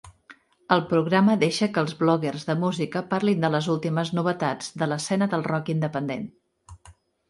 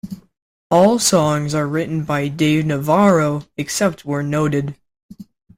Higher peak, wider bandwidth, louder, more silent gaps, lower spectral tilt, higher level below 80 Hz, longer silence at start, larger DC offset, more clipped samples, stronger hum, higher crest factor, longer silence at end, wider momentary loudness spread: about the same, -4 dBFS vs -2 dBFS; second, 11.5 kHz vs 16.5 kHz; second, -24 LUFS vs -17 LUFS; second, none vs 0.42-0.70 s, 5.03-5.09 s; about the same, -6 dB/octave vs -5 dB/octave; second, -62 dBFS vs -52 dBFS; about the same, 0.05 s vs 0.05 s; neither; neither; neither; first, 22 dB vs 16 dB; about the same, 0.4 s vs 0.35 s; about the same, 8 LU vs 10 LU